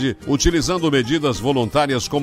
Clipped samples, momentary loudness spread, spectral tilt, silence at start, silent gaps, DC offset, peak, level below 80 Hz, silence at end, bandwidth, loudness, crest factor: under 0.1%; 2 LU; -4.5 dB/octave; 0 s; none; under 0.1%; -2 dBFS; -32 dBFS; 0 s; 16 kHz; -19 LUFS; 16 dB